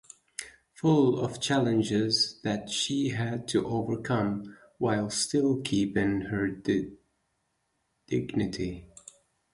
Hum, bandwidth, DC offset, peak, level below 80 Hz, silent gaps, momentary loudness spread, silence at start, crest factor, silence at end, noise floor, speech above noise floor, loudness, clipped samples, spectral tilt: none; 11.5 kHz; under 0.1%; -14 dBFS; -56 dBFS; none; 13 LU; 0.4 s; 16 dB; 0.65 s; -77 dBFS; 49 dB; -28 LUFS; under 0.1%; -5 dB/octave